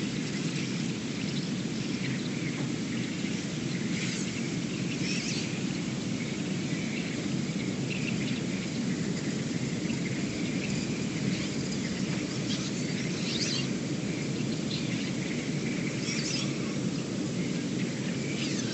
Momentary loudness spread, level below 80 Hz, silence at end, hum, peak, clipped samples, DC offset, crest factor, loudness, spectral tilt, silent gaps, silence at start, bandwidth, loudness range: 2 LU; -58 dBFS; 0 s; none; -16 dBFS; under 0.1%; under 0.1%; 14 dB; -32 LUFS; -4.5 dB/octave; none; 0 s; 8.6 kHz; 1 LU